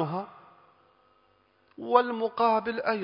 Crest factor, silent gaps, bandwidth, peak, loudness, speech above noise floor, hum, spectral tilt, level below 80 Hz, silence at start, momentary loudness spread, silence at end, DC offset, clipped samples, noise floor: 24 dB; none; 5.4 kHz; -6 dBFS; -27 LUFS; 39 dB; none; -9.5 dB/octave; -74 dBFS; 0 s; 15 LU; 0 s; under 0.1%; under 0.1%; -66 dBFS